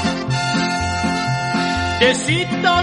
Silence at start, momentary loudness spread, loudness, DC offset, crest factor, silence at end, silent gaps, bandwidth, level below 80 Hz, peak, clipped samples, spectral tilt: 0 s; 4 LU; -18 LUFS; under 0.1%; 16 dB; 0 s; none; 11.5 kHz; -42 dBFS; -2 dBFS; under 0.1%; -4.5 dB/octave